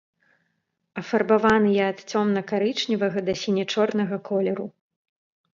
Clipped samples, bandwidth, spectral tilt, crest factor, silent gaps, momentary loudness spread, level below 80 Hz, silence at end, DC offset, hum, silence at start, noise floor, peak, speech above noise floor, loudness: under 0.1%; 7.6 kHz; -5.5 dB/octave; 20 dB; none; 9 LU; -60 dBFS; 0.9 s; under 0.1%; none; 0.95 s; -75 dBFS; -6 dBFS; 52 dB; -23 LUFS